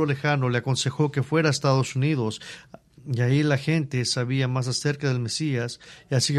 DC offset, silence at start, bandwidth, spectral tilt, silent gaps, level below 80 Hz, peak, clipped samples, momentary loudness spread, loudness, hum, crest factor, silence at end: under 0.1%; 0 s; 12 kHz; -5 dB/octave; none; -60 dBFS; -6 dBFS; under 0.1%; 10 LU; -24 LUFS; none; 18 dB; 0 s